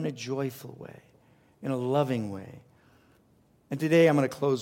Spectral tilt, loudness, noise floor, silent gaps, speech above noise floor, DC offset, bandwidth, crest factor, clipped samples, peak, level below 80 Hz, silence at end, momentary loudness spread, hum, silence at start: -6.5 dB/octave; -27 LUFS; -64 dBFS; none; 36 dB; under 0.1%; 17 kHz; 18 dB; under 0.1%; -10 dBFS; -72 dBFS; 0 s; 23 LU; none; 0 s